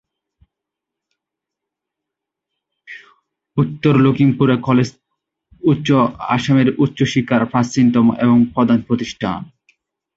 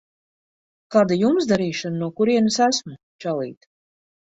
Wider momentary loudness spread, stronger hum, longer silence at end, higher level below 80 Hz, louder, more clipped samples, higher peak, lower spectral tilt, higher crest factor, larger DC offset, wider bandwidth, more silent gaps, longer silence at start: about the same, 10 LU vs 11 LU; neither; about the same, 0.7 s vs 0.75 s; first, -52 dBFS vs -64 dBFS; first, -16 LUFS vs -21 LUFS; neither; about the same, -2 dBFS vs -4 dBFS; first, -7 dB/octave vs -5 dB/octave; about the same, 16 dB vs 18 dB; neither; about the same, 7.8 kHz vs 8 kHz; second, none vs 3.03-3.19 s; first, 2.9 s vs 0.9 s